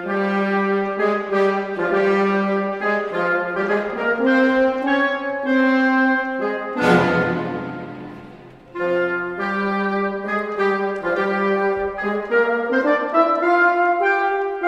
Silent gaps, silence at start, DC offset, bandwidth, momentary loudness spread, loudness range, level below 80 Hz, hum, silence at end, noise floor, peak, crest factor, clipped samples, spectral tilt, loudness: none; 0 s; under 0.1%; 10.5 kHz; 7 LU; 4 LU; -56 dBFS; none; 0 s; -41 dBFS; -2 dBFS; 18 dB; under 0.1%; -7 dB/octave; -19 LUFS